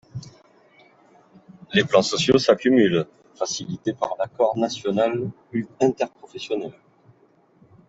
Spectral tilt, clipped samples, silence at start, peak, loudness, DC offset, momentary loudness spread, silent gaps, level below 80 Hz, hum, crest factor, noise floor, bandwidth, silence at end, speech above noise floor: -4.5 dB/octave; under 0.1%; 0.15 s; -4 dBFS; -22 LUFS; under 0.1%; 13 LU; none; -62 dBFS; none; 20 dB; -58 dBFS; 8 kHz; 1.2 s; 37 dB